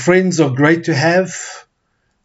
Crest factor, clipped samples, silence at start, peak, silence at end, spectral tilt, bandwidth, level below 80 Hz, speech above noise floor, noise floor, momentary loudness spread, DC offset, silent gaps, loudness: 14 dB; under 0.1%; 0 s; 0 dBFS; 0.65 s; -5.5 dB/octave; 8 kHz; -60 dBFS; 52 dB; -65 dBFS; 13 LU; under 0.1%; none; -14 LUFS